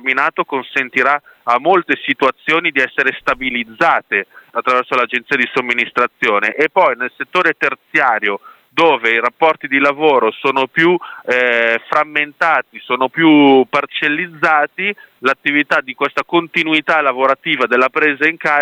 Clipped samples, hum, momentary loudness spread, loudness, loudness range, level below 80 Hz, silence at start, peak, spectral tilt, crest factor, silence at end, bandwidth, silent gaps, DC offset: under 0.1%; none; 6 LU; -14 LUFS; 2 LU; -60 dBFS; 0.05 s; 0 dBFS; -5 dB/octave; 14 dB; 0 s; 10 kHz; none; under 0.1%